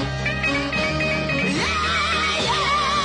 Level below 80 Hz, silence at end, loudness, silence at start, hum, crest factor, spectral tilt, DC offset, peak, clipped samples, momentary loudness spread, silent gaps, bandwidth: -38 dBFS; 0 s; -20 LUFS; 0 s; none; 10 dB; -4 dB/octave; under 0.1%; -10 dBFS; under 0.1%; 2 LU; none; 11 kHz